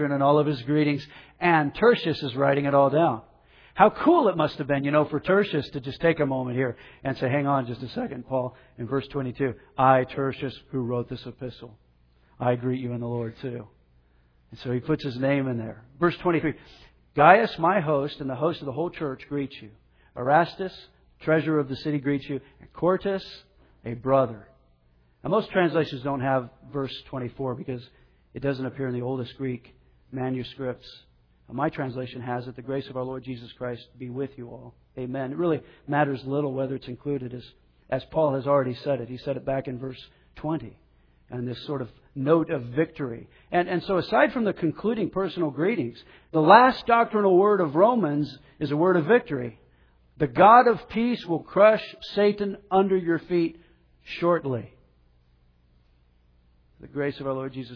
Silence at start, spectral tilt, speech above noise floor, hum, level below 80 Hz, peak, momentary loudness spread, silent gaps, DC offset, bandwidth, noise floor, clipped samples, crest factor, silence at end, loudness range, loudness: 0 s; -9 dB/octave; 37 dB; none; -58 dBFS; -2 dBFS; 16 LU; none; under 0.1%; 5.4 kHz; -62 dBFS; under 0.1%; 24 dB; 0 s; 11 LU; -25 LUFS